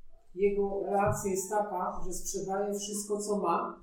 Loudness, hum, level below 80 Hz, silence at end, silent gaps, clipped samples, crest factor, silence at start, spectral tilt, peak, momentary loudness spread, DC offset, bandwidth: -32 LUFS; none; -48 dBFS; 0 s; none; under 0.1%; 16 dB; 0.05 s; -4.5 dB/octave; -16 dBFS; 7 LU; under 0.1%; 18.5 kHz